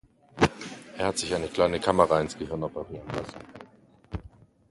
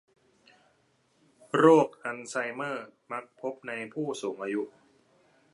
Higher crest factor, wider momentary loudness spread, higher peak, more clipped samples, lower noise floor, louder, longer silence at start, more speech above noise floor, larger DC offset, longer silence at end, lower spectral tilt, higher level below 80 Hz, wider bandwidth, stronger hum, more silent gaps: about the same, 24 dB vs 24 dB; about the same, 18 LU vs 19 LU; about the same, -4 dBFS vs -6 dBFS; neither; second, -56 dBFS vs -69 dBFS; about the same, -27 LUFS vs -29 LUFS; second, 0.35 s vs 1.55 s; second, 28 dB vs 41 dB; neither; second, 0.45 s vs 0.85 s; about the same, -5 dB/octave vs -5.5 dB/octave; first, -48 dBFS vs -84 dBFS; about the same, 11.5 kHz vs 11.5 kHz; neither; neither